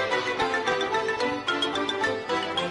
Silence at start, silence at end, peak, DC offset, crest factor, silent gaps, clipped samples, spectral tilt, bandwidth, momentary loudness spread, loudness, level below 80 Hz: 0 s; 0 s; -12 dBFS; under 0.1%; 14 dB; none; under 0.1%; -3 dB/octave; 11.5 kHz; 2 LU; -26 LUFS; -60 dBFS